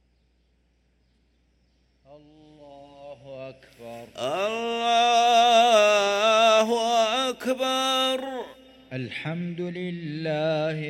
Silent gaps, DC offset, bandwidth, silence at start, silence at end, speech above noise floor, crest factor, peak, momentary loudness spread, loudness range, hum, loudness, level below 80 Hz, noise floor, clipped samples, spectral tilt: none; under 0.1%; 16 kHz; 2.1 s; 0 s; 37 dB; 18 dB; -6 dBFS; 23 LU; 11 LU; none; -22 LUFS; -66 dBFS; -66 dBFS; under 0.1%; -3.5 dB/octave